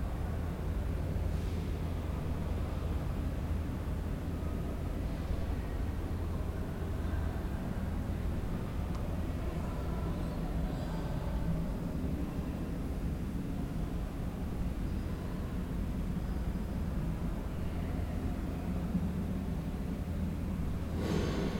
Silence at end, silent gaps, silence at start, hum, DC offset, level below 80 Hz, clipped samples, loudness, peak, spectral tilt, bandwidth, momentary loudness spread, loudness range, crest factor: 0 s; none; 0 s; none; under 0.1%; -38 dBFS; under 0.1%; -37 LUFS; -20 dBFS; -7.5 dB/octave; 16.5 kHz; 2 LU; 1 LU; 14 dB